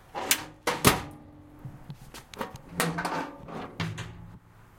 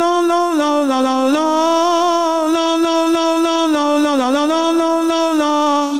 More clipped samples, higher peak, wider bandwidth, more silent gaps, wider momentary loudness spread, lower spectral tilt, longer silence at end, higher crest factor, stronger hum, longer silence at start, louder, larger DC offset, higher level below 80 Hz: neither; about the same, -2 dBFS vs -4 dBFS; about the same, 16.5 kHz vs 16 kHz; neither; first, 23 LU vs 1 LU; about the same, -3 dB/octave vs -2 dB/octave; about the same, 0.05 s vs 0 s; first, 30 dB vs 10 dB; neither; about the same, 0 s vs 0 s; second, -29 LUFS vs -15 LUFS; second, under 0.1% vs 0.5%; first, -52 dBFS vs -60 dBFS